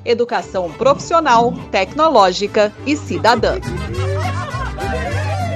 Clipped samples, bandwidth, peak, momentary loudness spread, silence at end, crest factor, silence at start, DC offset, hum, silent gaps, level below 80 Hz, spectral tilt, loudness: under 0.1%; 13.5 kHz; 0 dBFS; 10 LU; 0 s; 16 dB; 0 s; under 0.1%; none; none; -34 dBFS; -5.5 dB/octave; -16 LUFS